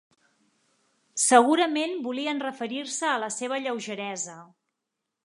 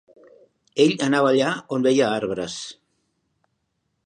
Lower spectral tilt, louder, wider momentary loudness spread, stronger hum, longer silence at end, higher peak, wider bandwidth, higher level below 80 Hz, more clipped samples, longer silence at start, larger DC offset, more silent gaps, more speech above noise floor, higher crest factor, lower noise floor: second, -2 dB/octave vs -4.5 dB/octave; second, -26 LUFS vs -21 LUFS; about the same, 14 LU vs 13 LU; neither; second, 0.8 s vs 1.35 s; about the same, -2 dBFS vs -4 dBFS; first, 11.5 kHz vs 10 kHz; second, -84 dBFS vs -66 dBFS; neither; first, 1.15 s vs 0.75 s; neither; neither; first, 58 dB vs 54 dB; first, 24 dB vs 18 dB; first, -84 dBFS vs -74 dBFS